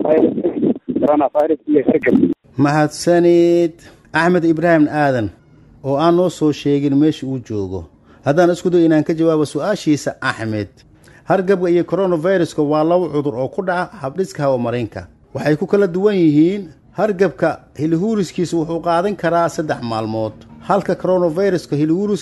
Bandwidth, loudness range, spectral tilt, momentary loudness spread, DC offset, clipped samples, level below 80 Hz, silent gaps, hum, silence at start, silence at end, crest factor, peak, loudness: 12 kHz; 4 LU; -7 dB/octave; 10 LU; under 0.1%; under 0.1%; -52 dBFS; none; none; 0 s; 0 s; 16 dB; 0 dBFS; -17 LUFS